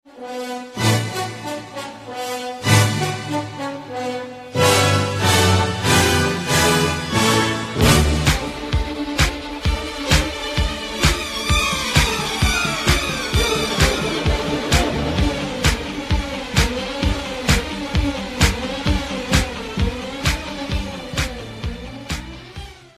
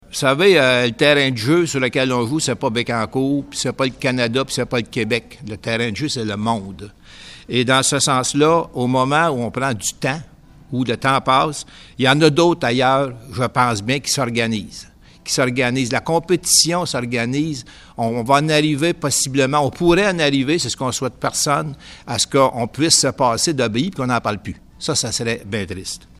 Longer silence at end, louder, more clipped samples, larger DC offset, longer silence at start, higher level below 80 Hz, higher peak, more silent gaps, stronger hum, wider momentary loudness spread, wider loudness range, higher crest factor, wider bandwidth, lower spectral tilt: about the same, 0.1 s vs 0.2 s; about the same, -19 LUFS vs -18 LUFS; neither; neither; about the same, 0.05 s vs 0.1 s; first, -28 dBFS vs -48 dBFS; about the same, 0 dBFS vs 0 dBFS; neither; neither; about the same, 13 LU vs 11 LU; about the same, 6 LU vs 4 LU; about the same, 20 dB vs 18 dB; about the same, 15 kHz vs 15.5 kHz; about the same, -4 dB/octave vs -3.5 dB/octave